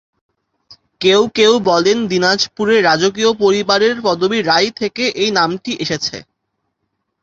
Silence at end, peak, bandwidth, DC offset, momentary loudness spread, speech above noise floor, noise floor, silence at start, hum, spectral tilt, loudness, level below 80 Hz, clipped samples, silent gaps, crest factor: 1 s; 0 dBFS; 7.8 kHz; under 0.1%; 7 LU; 58 dB; -72 dBFS; 0.7 s; none; -3.5 dB/octave; -14 LUFS; -56 dBFS; under 0.1%; none; 16 dB